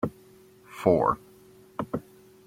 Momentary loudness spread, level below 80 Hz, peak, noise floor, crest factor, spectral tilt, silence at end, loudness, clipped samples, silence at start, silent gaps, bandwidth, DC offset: 17 LU; -58 dBFS; -6 dBFS; -54 dBFS; 24 dB; -8 dB/octave; 0.45 s; -28 LUFS; under 0.1%; 0 s; none; 16.5 kHz; under 0.1%